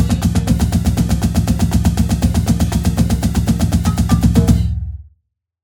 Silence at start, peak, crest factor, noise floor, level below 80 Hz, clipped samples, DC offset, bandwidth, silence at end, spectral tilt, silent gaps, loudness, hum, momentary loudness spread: 0 s; 0 dBFS; 14 dB; -66 dBFS; -20 dBFS; under 0.1%; under 0.1%; 18.5 kHz; 0.6 s; -6.5 dB/octave; none; -16 LUFS; none; 3 LU